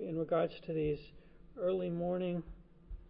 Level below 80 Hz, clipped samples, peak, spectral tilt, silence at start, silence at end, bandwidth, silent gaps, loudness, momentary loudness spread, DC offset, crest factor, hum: -56 dBFS; under 0.1%; -22 dBFS; -7 dB/octave; 0 s; 0 s; 5.2 kHz; none; -37 LUFS; 17 LU; under 0.1%; 16 dB; none